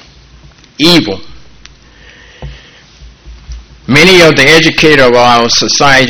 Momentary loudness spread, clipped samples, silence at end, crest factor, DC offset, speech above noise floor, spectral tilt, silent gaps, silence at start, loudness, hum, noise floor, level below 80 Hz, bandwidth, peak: 9 LU; 3%; 0 s; 8 dB; under 0.1%; 32 dB; -3.5 dB/octave; none; 0.8 s; -5 LUFS; none; -38 dBFS; -32 dBFS; over 20 kHz; 0 dBFS